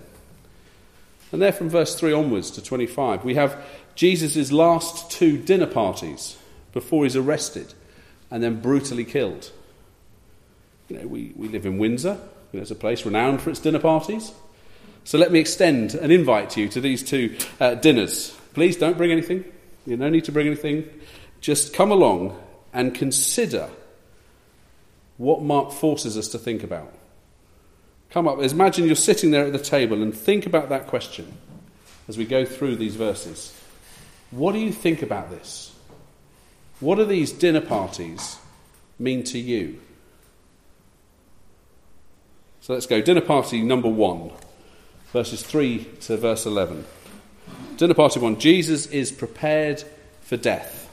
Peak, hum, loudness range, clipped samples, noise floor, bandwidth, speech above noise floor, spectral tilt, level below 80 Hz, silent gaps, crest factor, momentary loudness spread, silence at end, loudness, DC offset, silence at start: 0 dBFS; none; 8 LU; under 0.1%; -56 dBFS; 15.5 kHz; 34 dB; -4.5 dB/octave; -56 dBFS; none; 22 dB; 17 LU; 0.05 s; -21 LUFS; under 0.1%; 0 s